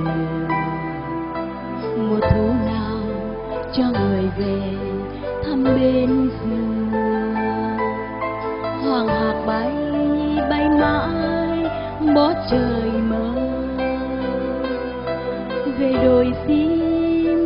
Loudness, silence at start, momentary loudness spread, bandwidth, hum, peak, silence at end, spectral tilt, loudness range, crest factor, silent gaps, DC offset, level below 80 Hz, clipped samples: -21 LUFS; 0 s; 9 LU; 5.4 kHz; none; -4 dBFS; 0 s; -6 dB/octave; 3 LU; 16 dB; none; under 0.1%; -38 dBFS; under 0.1%